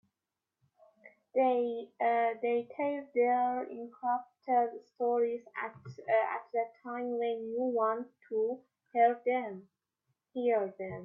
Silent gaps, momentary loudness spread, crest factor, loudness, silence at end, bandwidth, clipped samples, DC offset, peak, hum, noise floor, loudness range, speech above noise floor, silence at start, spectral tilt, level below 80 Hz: none; 11 LU; 18 dB; -33 LUFS; 0 s; 5.6 kHz; under 0.1%; under 0.1%; -14 dBFS; none; -90 dBFS; 2 LU; 58 dB; 1.05 s; -8 dB/octave; -84 dBFS